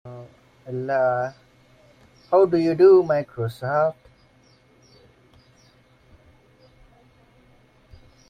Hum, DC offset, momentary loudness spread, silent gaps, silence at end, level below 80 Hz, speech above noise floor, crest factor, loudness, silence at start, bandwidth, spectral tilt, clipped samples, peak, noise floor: none; under 0.1%; 18 LU; none; 4.35 s; -60 dBFS; 37 dB; 20 dB; -20 LUFS; 0.05 s; 6.2 kHz; -8.5 dB/octave; under 0.1%; -4 dBFS; -57 dBFS